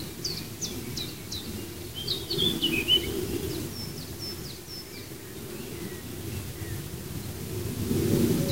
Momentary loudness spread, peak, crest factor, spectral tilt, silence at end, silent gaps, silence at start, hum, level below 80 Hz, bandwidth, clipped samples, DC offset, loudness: 14 LU; -10 dBFS; 20 dB; -4 dB/octave; 0 s; none; 0 s; none; -48 dBFS; 16 kHz; under 0.1%; 0.3%; -30 LUFS